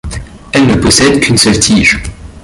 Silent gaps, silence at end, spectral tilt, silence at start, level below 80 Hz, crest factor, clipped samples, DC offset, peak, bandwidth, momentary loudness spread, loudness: none; 0.05 s; -3.5 dB/octave; 0.05 s; -26 dBFS; 10 dB; 0.2%; under 0.1%; 0 dBFS; 16 kHz; 17 LU; -8 LUFS